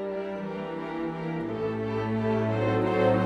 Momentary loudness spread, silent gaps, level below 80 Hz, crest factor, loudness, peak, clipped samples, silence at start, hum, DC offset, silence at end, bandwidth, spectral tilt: 9 LU; none; -56 dBFS; 16 dB; -29 LUFS; -12 dBFS; under 0.1%; 0 s; none; under 0.1%; 0 s; 8 kHz; -8.5 dB/octave